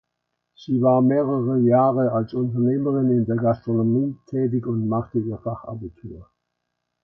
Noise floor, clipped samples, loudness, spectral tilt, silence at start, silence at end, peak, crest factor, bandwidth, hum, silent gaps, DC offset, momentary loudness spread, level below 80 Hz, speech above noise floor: -78 dBFS; under 0.1%; -21 LUFS; -11.5 dB/octave; 0.6 s; 0.8 s; -6 dBFS; 16 dB; 5.8 kHz; 60 Hz at -40 dBFS; none; under 0.1%; 16 LU; -56 dBFS; 58 dB